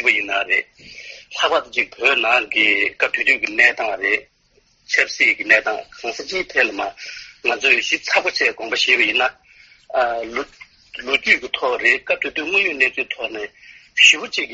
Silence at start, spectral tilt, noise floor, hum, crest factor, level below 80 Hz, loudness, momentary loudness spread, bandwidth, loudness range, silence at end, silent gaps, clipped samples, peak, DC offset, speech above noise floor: 0 s; 2.5 dB/octave; -59 dBFS; none; 20 dB; -58 dBFS; -17 LUFS; 14 LU; 8 kHz; 3 LU; 0 s; none; under 0.1%; 0 dBFS; under 0.1%; 40 dB